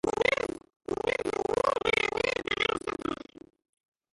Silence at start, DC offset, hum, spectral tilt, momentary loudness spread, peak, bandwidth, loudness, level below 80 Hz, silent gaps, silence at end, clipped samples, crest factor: 0.05 s; under 0.1%; none; -3.5 dB/octave; 10 LU; -12 dBFS; 11.5 kHz; -29 LUFS; -56 dBFS; 0.76-0.80 s; 0.95 s; under 0.1%; 18 dB